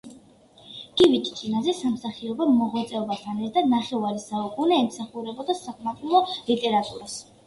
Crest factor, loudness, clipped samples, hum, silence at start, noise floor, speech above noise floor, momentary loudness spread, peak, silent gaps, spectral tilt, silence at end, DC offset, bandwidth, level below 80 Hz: 18 dB; -25 LUFS; under 0.1%; none; 0.05 s; -53 dBFS; 29 dB; 13 LU; -6 dBFS; none; -5 dB/octave; 0.25 s; under 0.1%; 11.5 kHz; -62 dBFS